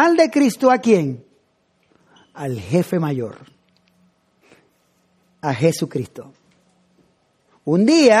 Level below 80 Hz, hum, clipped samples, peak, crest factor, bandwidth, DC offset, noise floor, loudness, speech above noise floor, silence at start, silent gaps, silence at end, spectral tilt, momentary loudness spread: -64 dBFS; none; under 0.1%; -2 dBFS; 18 dB; 14.5 kHz; under 0.1%; -63 dBFS; -18 LUFS; 47 dB; 0 s; none; 0 s; -6 dB/octave; 17 LU